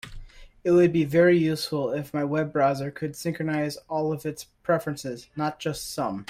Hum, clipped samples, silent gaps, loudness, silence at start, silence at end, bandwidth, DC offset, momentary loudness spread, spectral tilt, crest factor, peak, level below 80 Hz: none; under 0.1%; none; -25 LUFS; 0.05 s; 0.05 s; 16 kHz; under 0.1%; 13 LU; -6 dB/octave; 16 dB; -8 dBFS; -52 dBFS